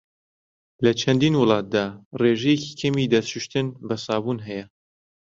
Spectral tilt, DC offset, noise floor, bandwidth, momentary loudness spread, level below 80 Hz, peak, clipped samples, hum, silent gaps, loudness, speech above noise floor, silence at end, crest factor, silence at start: -6 dB/octave; under 0.1%; under -90 dBFS; 7.8 kHz; 11 LU; -58 dBFS; -4 dBFS; under 0.1%; none; 2.05-2.11 s; -22 LUFS; over 68 dB; 0.55 s; 20 dB; 0.8 s